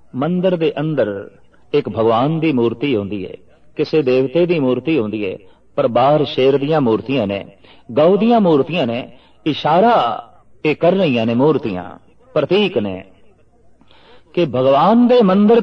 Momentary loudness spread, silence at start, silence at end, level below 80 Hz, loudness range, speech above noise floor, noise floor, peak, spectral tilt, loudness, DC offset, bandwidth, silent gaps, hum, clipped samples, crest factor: 14 LU; 0.15 s; 0 s; -58 dBFS; 3 LU; 33 dB; -48 dBFS; -2 dBFS; -8.5 dB/octave; -16 LUFS; under 0.1%; 6.4 kHz; none; none; under 0.1%; 14 dB